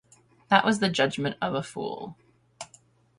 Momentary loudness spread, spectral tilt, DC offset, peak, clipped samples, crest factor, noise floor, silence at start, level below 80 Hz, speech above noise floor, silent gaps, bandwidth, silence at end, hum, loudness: 22 LU; -4.5 dB/octave; under 0.1%; -2 dBFS; under 0.1%; 26 dB; -59 dBFS; 0.5 s; -66 dBFS; 34 dB; none; 11.5 kHz; 0.55 s; none; -26 LUFS